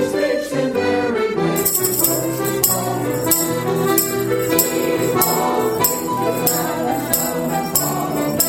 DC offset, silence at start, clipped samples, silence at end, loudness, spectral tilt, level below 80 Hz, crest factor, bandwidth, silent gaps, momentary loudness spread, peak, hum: under 0.1%; 0 s; under 0.1%; 0 s; -18 LUFS; -3.5 dB/octave; -50 dBFS; 18 dB; 17.5 kHz; none; 4 LU; 0 dBFS; none